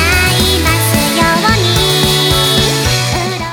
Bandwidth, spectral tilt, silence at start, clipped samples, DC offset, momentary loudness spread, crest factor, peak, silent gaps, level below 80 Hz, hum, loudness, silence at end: over 20 kHz; -3.5 dB/octave; 0 s; under 0.1%; under 0.1%; 3 LU; 12 dB; 0 dBFS; none; -24 dBFS; none; -10 LUFS; 0 s